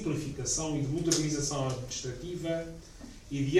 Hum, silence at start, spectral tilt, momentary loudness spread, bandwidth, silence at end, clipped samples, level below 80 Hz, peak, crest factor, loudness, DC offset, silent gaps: none; 0 s; -4.5 dB/octave; 16 LU; 14.5 kHz; 0 s; under 0.1%; -50 dBFS; -10 dBFS; 22 dB; -32 LUFS; under 0.1%; none